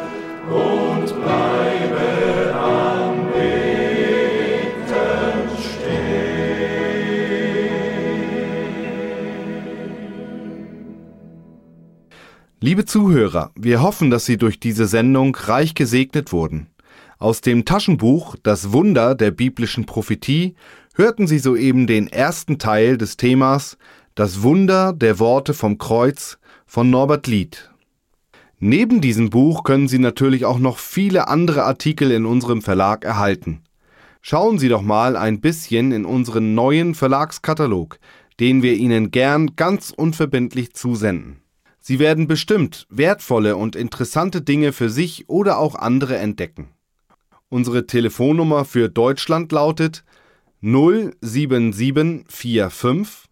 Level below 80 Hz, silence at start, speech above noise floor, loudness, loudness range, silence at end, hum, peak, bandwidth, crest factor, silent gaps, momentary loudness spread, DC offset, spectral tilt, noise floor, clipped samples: -48 dBFS; 0 s; 49 dB; -18 LUFS; 5 LU; 0.15 s; none; -4 dBFS; 17 kHz; 14 dB; none; 10 LU; under 0.1%; -6.5 dB/octave; -65 dBFS; under 0.1%